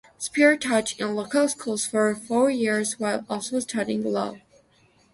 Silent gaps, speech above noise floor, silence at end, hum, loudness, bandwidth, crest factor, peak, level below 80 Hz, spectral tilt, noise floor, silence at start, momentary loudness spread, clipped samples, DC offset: none; 37 dB; 0.75 s; none; -24 LUFS; 11.5 kHz; 20 dB; -6 dBFS; -66 dBFS; -3.5 dB/octave; -60 dBFS; 0.2 s; 9 LU; under 0.1%; under 0.1%